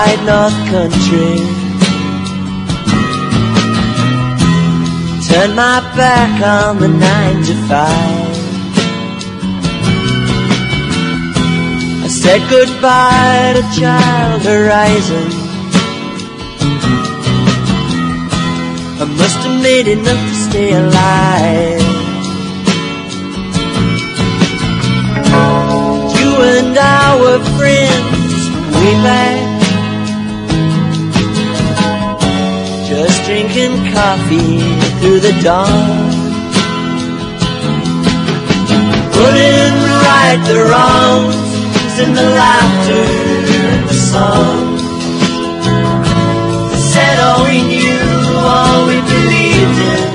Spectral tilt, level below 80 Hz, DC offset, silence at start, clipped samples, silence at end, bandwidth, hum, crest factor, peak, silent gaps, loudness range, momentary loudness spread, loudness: -5 dB/octave; -32 dBFS; under 0.1%; 0 s; 0.3%; 0 s; 11 kHz; none; 10 dB; 0 dBFS; none; 5 LU; 8 LU; -11 LUFS